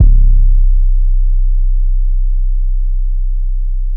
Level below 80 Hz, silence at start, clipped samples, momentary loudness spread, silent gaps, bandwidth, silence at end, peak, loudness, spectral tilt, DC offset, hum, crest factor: -10 dBFS; 0 s; 0.2%; 7 LU; none; 0.4 kHz; 0 s; 0 dBFS; -17 LUFS; -17 dB/octave; under 0.1%; none; 10 dB